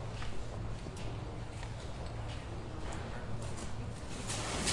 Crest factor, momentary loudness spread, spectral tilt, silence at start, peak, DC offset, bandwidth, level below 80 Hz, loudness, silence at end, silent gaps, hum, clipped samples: 22 dB; 5 LU; -4 dB/octave; 0 s; -18 dBFS; 0.2%; 11.5 kHz; -46 dBFS; -42 LUFS; 0 s; none; none; under 0.1%